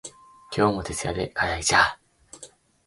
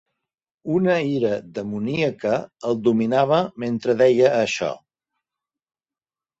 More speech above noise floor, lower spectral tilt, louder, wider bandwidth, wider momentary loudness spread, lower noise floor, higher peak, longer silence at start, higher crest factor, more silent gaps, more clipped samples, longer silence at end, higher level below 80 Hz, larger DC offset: second, 26 dB vs over 70 dB; second, -3 dB/octave vs -6 dB/octave; about the same, -23 LUFS vs -21 LUFS; first, 11.5 kHz vs 8 kHz; first, 25 LU vs 10 LU; second, -50 dBFS vs under -90 dBFS; about the same, -4 dBFS vs -4 dBFS; second, 0.05 s vs 0.65 s; about the same, 22 dB vs 18 dB; neither; neither; second, 0.4 s vs 1.65 s; first, -46 dBFS vs -62 dBFS; neither